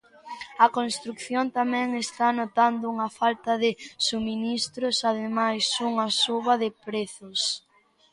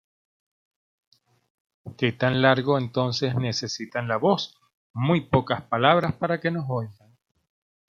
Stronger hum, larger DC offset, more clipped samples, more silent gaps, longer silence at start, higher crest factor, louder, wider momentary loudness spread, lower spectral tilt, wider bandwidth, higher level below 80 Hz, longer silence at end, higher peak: neither; neither; neither; second, none vs 4.74-4.94 s; second, 0.25 s vs 1.85 s; about the same, 20 dB vs 22 dB; about the same, -25 LUFS vs -24 LUFS; about the same, 9 LU vs 10 LU; second, -2.5 dB/octave vs -6 dB/octave; first, 11.5 kHz vs 7.4 kHz; second, -68 dBFS vs -60 dBFS; second, 0.55 s vs 0.95 s; about the same, -6 dBFS vs -4 dBFS